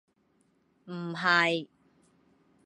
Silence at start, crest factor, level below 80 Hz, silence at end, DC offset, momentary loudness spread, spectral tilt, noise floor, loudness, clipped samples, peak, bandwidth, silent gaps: 0.85 s; 24 dB; -82 dBFS; 1 s; under 0.1%; 19 LU; -4.5 dB/octave; -70 dBFS; -27 LUFS; under 0.1%; -10 dBFS; 11 kHz; none